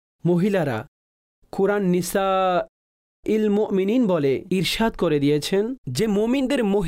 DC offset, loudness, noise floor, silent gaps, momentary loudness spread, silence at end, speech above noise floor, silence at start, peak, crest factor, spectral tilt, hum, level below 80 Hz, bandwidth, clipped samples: under 0.1%; -22 LUFS; under -90 dBFS; 0.88-1.42 s, 2.69-3.23 s, 5.78-5.84 s; 6 LU; 0 s; over 69 dB; 0.25 s; -12 dBFS; 10 dB; -6 dB/octave; none; -48 dBFS; 16 kHz; under 0.1%